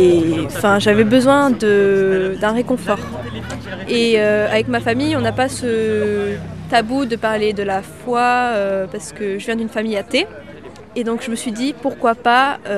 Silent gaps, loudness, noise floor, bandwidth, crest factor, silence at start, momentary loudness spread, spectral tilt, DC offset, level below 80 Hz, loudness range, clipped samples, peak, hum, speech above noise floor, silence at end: none; -17 LUFS; -36 dBFS; 14 kHz; 16 dB; 0 s; 12 LU; -5 dB/octave; 0.3%; -46 dBFS; 5 LU; under 0.1%; 0 dBFS; none; 20 dB; 0 s